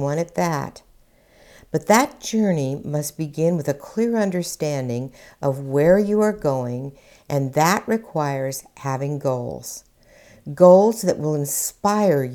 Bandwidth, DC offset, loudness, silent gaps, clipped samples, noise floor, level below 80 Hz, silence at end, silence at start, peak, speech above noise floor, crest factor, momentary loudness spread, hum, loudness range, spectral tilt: 19.5 kHz; under 0.1%; -21 LUFS; none; under 0.1%; -54 dBFS; -54 dBFS; 0 s; 0 s; 0 dBFS; 34 dB; 20 dB; 13 LU; none; 4 LU; -5.5 dB/octave